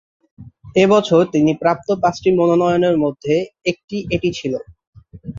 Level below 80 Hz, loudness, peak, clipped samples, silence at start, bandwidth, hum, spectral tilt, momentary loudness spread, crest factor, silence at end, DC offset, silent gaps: -48 dBFS; -17 LUFS; -2 dBFS; under 0.1%; 0.4 s; 7.6 kHz; none; -6.5 dB/octave; 11 LU; 16 dB; 0 s; under 0.1%; 3.84-3.88 s, 4.87-4.93 s